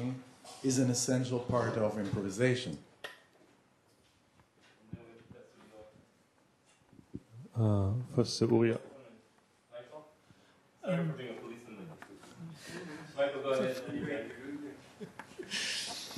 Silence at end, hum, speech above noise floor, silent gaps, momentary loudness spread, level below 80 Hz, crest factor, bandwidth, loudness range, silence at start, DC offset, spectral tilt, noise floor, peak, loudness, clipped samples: 0 s; none; 37 dB; none; 22 LU; -70 dBFS; 22 dB; 13 kHz; 9 LU; 0 s; under 0.1%; -5 dB/octave; -69 dBFS; -14 dBFS; -34 LUFS; under 0.1%